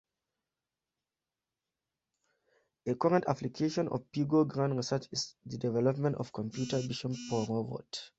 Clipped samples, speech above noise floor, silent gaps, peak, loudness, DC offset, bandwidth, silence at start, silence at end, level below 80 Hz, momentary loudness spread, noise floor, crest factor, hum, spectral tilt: under 0.1%; over 58 dB; none; -14 dBFS; -33 LUFS; under 0.1%; 8.2 kHz; 2.85 s; 0.1 s; -70 dBFS; 9 LU; under -90 dBFS; 20 dB; none; -6 dB/octave